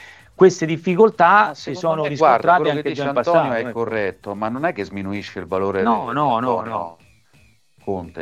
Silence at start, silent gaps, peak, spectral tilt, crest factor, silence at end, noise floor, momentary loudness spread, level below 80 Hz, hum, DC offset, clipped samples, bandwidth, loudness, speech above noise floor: 0 s; none; 0 dBFS; -6 dB/octave; 18 dB; 0 s; -56 dBFS; 14 LU; -58 dBFS; none; under 0.1%; under 0.1%; 9.2 kHz; -19 LUFS; 37 dB